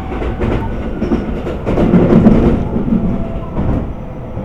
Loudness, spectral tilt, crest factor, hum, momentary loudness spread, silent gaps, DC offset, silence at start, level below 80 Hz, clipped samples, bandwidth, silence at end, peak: -15 LUFS; -9.5 dB/octave; 14 dB; none; 13 LU; none; under 0.1%; 0 s; -22 dBFS; 0.4%; 7.2 kHz; 0 s; 0 dBFS